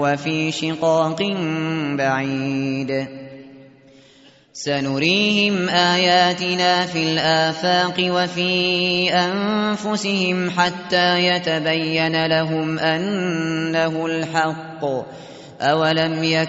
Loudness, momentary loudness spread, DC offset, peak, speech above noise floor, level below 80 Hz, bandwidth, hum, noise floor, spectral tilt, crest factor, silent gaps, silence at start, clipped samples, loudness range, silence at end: -19 LUFS; 8 LU; under 0.1%; -4 dBFS; 31 dB; -60 dBFS; 8 kHz; none; -50 dBFS; -3 dB/octave; 16 dB; none; 0 s; under 0.1%; 6 LU; 0 s